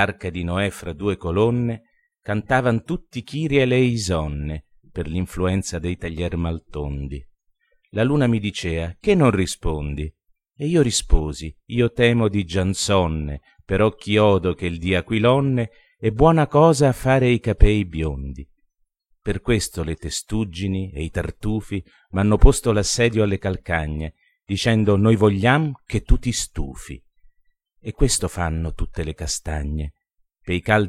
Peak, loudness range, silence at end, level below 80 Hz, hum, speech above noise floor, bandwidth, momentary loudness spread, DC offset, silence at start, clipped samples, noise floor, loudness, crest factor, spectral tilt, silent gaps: 0 dBFS; 8 LU; 0 s; -28 dBFS; none; 47 dB; 14.5 kHz; 14 LU; under 0.1%; 0 s; under 0.1%; -67 dBFS; -21 LUFS; 20 dB; -5.5 dB/octave; none